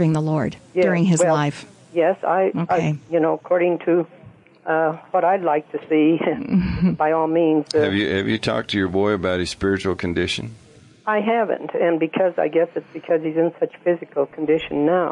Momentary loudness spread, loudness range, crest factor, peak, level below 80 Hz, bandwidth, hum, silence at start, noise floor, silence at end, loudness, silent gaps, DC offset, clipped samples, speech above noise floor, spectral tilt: 6 LU; 3 LU; 12 dB; -8 dBFS; -48 dBFS; 11 kHz; none; 0 s; -47 dBFS; 0 s; -20 LUFS; none; under 0.1%; under 0.1%; 27 dB; -6 dB/octave